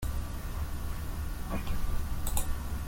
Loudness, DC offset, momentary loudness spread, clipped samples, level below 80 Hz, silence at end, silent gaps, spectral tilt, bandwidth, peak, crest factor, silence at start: -37 LUFS; under 0.1%; 4 LU; under 0.1%; -34 dBFS; 0 s; none; -5 dB/octave; 17 kHz; -12 dBFS; 20 dB; 0 s